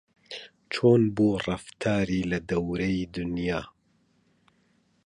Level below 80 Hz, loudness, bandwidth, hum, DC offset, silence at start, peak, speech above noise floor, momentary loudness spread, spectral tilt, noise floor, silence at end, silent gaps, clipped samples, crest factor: -50 dBFS; -26 LUFS; 11 kHz; none; under 0.1%; 0.3 s; -8 dBFS; 42 dB; 20 LU; -7 dB/octave; -67 dBFS; 1.35 s; none; under 0.1%; 20 dB